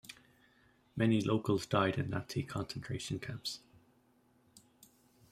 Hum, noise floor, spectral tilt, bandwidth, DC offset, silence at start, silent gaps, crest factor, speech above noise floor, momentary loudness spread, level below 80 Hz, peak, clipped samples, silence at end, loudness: none; -70 dBFS; -6 dB/octave; 16 kHz; under 0.1%; 0.05 s; none; 22 dB; 35 dB; 16 LU; -64 dBFS; -16 dBFS; under 0.1%; 0.75 s; -35 LUFS